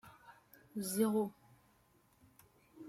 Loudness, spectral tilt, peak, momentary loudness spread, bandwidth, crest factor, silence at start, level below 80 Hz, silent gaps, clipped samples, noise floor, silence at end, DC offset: -37 LUFS; -5 dB/octave; -22 dBFS; 26 LU; 16 kHz; 20 dB; 0.05 s; -80 dBFS; none; under 0.1%; -71 dBFS; 0 s; under 0.1%